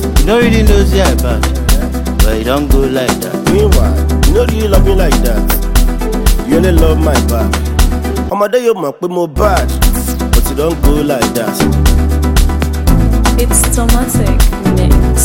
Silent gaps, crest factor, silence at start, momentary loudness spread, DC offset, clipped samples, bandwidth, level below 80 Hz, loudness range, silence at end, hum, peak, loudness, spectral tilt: none; 10 dB; 0 s; 4 LU; under 0.1%; under 0.1%; 17.5 kHz; -12 dBFS; 2 LU; 0 s; none; 0 dBFS; -12 LUFS; -5.5 dB/octave